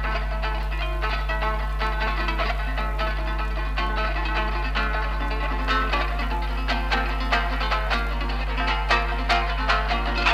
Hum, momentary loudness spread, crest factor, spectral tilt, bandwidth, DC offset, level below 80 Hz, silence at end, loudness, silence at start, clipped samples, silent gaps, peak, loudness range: none; 5 LU; 16 dB; -5 dB/octave; 8.2 kHz; under 0.1%; -26 dBFS; 0 s; -25 LUFS; 0 s; under 0.1%; none; -8 dBFS; 3 LU